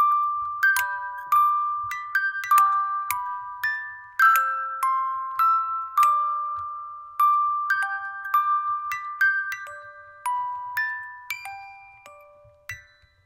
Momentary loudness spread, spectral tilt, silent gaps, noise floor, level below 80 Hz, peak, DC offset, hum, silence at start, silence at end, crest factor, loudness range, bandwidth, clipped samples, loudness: 16 LU; 1.5 dB/octave; none; -52 dBFS; -70 dBFS; -6 dBFS; under 0.1%; none; 0 s; 0.45 s; 18 dB; 6 LU; 16 kHz; under 0.1%; -23 LUFS